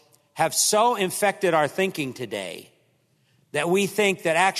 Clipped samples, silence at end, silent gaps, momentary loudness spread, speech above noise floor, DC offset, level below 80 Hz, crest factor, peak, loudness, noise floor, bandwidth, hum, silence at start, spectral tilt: under 0.1%; 0 s; none; 13 LU; 42 dB; under 0.1%; -72 dBFS; 18 dB; -6 dBFS; -23 LUFS; -65 dBFS; 14 kHz; none; 0.35 s; -3 dB/octave